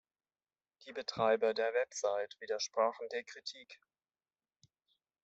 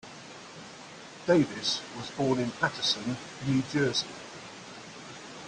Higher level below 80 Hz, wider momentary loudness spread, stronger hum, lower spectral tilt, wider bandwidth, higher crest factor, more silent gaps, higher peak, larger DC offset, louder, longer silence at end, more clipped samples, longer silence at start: second, -84 dBFS vs -66 dBFS; second, 15 LU vs 19 LU; neither; second, -2.5 dB/octave vs -4.5 dB/octave; second, 8.2 kHz vs 10 kHz; about the same, 20 dB vs 20 dB; neither; second, -18 dBFS vs -10 dBFS; neither; second, -36 LUFS vs -29 LUFS; first, 1.5 s vs 0 s; neither; first, 0.85 s vs 0.05 s